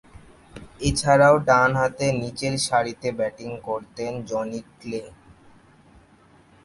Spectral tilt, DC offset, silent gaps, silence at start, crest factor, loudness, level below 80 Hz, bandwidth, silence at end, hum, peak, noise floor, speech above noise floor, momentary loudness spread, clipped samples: -4.5 dB/octave; under 0.1%; none; 0.55 s; 20 dB; -22 LUFS; -46 dBFS; 11.5 kHz; 1.55 s; none; -4 dBFS; -54 dBFS; 32 dB; 17 LU; under 0.1%